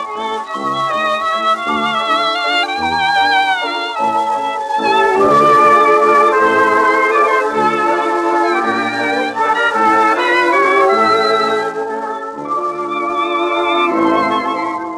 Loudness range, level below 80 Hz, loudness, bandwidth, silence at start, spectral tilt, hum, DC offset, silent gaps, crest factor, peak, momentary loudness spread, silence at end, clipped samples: 5 LU; -56 dBFS; -13 LUFS; 13.5 kHz; 0 s; -3.5 dB/octave; none; under 0.1%; none; 12 dB; -2 dBFS; 9 LU; 0 s; under 0.1%